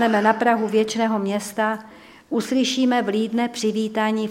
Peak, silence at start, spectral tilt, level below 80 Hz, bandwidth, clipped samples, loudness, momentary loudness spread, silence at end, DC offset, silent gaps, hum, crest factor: -2 dBFS; 0 s; -4.5 dB/octave; -66 dBFS; 16 kHz; under 0.1%; -21 LUFS; 7 LU; 0 s; under 0.1%; none; none; 18 dB